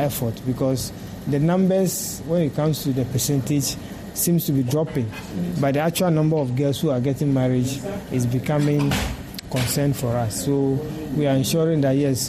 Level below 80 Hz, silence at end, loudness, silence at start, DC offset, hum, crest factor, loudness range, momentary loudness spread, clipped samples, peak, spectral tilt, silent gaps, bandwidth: -44 dBFS; 0 s; -22 LUFS; 0 s; under 0.1%; none; 12 dB; 1 LU; 8 LU; under 0.1%; -10 dBFS; -5.5 dB/octave; none; 15.5 kHz